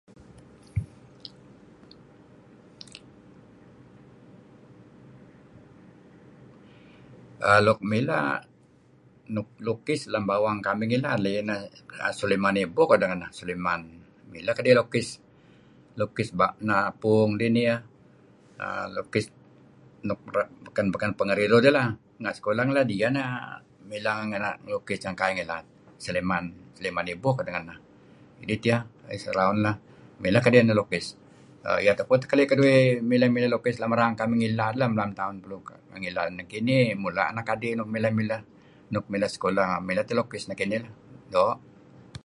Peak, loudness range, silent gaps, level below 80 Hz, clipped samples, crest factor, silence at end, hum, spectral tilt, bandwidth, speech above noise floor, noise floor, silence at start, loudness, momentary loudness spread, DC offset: -2 dBFS; 7 LU; none; -58 dBFS; under 0.1%; 24 dB; 0.65 s; none; -6.5 dB/octave; 11.5 kHz; 33 dB; -58 dBFS; 0.35 s; -26 LUFS; 16 LU; under 0.1%